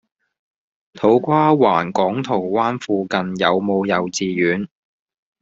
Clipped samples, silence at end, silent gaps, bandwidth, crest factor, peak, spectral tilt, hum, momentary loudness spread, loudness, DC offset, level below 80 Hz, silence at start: under 0.1%; 0.75 s; none; 8 kHz; 18 dB; -2 dBFS; -4.5 dB/octave; none; 7 LU; -18 LUFS; under 0.1%; -60 dBFS; 0.95 s